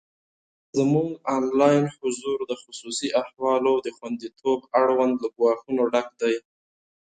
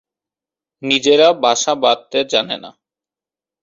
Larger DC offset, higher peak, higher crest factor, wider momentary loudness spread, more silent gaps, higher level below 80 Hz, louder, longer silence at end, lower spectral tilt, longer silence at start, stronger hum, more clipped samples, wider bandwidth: neither; second, -6 dBFS vs 0 dBFS; about the same, 18 dB vs 18 dB; about the same, 11 LU vs 13 LU; neither; about the same, -66 dBFS vs -64 dBFS; second, -24 LUFS vs -15 LUFS; second, 0.8 s vs 0.95 s; first, -5.5 dB/octave vs -2 dB/octave; about the same, 0.75 s vs 0.8 s; neither; neither; first, 9.4 kHz vs 7.8 kHz